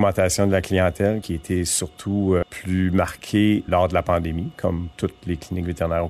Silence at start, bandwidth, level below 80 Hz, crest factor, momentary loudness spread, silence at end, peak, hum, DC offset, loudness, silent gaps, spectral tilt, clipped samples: 0 s; 14 kHz; -44 dBFS; 16 dB; 8 LU; 0 s; -6 dBFS; none; under 0.1%; -22 LUFS; none; -5.5 dB/octave; under 0.1%